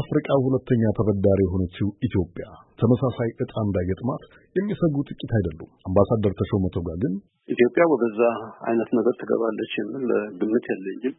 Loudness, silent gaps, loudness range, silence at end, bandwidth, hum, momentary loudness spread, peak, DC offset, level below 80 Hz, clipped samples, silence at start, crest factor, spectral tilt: -24 LUFS; none; 3 LU; 0.05 s; 4 kHz; none; 9 LU; -4 dBFS; under 0.1%; -48 dBFS; under 0.1%; 0 s; 18 dB; -12.5 dB/octave